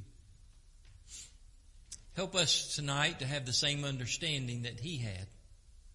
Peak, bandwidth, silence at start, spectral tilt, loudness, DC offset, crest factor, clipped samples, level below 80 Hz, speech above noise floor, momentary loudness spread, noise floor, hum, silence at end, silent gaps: -16 dBFS; 11.5 kHz; 0 s; -3 dB/octave; -33 LUFS; under 0.1%; 22 dB; under 0.1%; -58 dBFS; 23 dB; 21 LU; -58 dBFS; none; 0.05 s; none